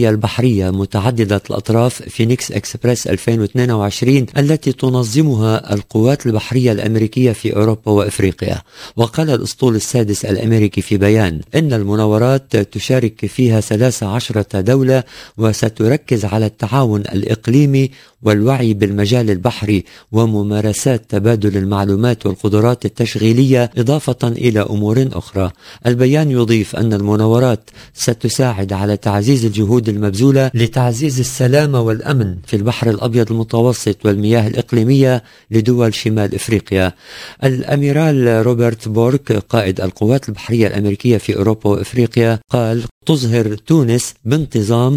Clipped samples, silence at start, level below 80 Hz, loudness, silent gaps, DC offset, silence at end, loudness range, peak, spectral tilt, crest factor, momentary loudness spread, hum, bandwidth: under 0.1%; 0 s; -38 dBFS; -15 LUFS; 42.91-43.01 s; under 0.1%; 0 s; 1 LU; 0 dBFS; -6.5 dB/octave; 14 dB; 5 LU; none; 16 kHz